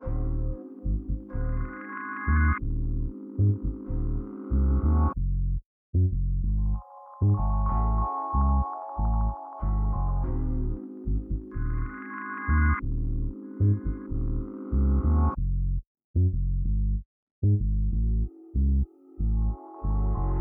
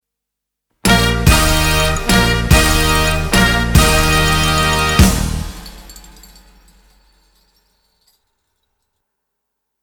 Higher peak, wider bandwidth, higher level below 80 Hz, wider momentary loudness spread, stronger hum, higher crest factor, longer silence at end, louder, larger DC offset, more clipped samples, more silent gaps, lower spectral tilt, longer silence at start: second, -12 dBFS vs 0 dBFS; second, 2.4 kHz vs over 20 kHz; second, -28 dBFS vs -22 dBFS; about the same, 10 LU vs 8 LU; neither; about the same, 14 dB vs 16 dB; second, 0 s vs 3.85 s; second, -29 LUFS vs -13 LUFS; neither; neither; first, 5.66-5.93 s, 15.87-15.95 s, 16.04-16.14 s, 17.05-17.42 s vs none; first, -13.5 dB/octave vs -4 dB/octave; second, 0 s vs 0.85 s